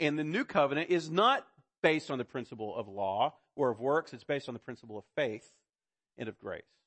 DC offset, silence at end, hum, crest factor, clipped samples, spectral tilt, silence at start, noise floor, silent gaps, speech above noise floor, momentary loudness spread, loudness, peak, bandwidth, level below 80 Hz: under 0.1%; 0.25 s; none; 20 dB; under 0.1%; -5.5 dB/octave; 0 s; under -90 dBFS; none; over 57 dB; 16 LU; -32 LUFS; -14 dBFS; 8.8 kHz; -76 dBFS